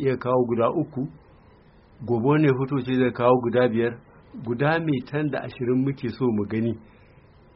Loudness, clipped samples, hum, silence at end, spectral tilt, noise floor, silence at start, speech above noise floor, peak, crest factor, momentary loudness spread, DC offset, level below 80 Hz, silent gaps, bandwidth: -24 LUFS; under 0.1%; none; 0.75 s; -7 dB/octave; -53 dBFS; 0 s; 30 dB; -4 dBFS; 20 dB; 13 LU; under 0.1%; -58 dBFS; none; 5.8 kHz